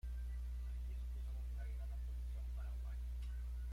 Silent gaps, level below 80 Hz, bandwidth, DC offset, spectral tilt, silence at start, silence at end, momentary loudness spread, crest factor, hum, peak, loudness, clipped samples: none; -44 dBFS; 11 kHz; under 0.1%; -6.5 dB/octave; 0.05 s; 0 s; 0 LU; 6 dB; 60 Hz at -45 dBFS; -38 dBFS; -48 LUFS; under 0.1%